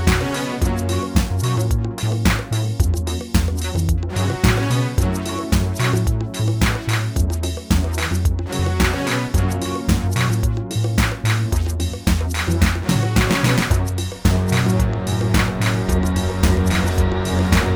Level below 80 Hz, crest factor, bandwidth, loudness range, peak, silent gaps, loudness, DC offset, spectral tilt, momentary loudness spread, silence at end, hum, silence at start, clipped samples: -24 dBFS; 18 dB; over 20 kHz; 2 LU; 0 dBFS; none; -20 LUFS; under 0.1%; -5.5 dB/octave; 4 LU; 0 s; none; 0 s; under 0.1%